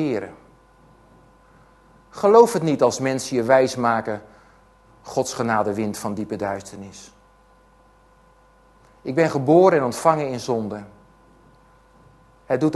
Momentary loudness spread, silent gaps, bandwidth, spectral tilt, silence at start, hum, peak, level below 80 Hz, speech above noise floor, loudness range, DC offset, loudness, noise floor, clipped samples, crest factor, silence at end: 19 LU; none; 12.5 kHz; -5.5 dB/octave; 0 s; none; -2 dBFS; -58 dBFS; 35 dB; 9 LU; under 0.1%; -20 LUFS; -54 dBFS; under 0.1%; 22 dB; 0 s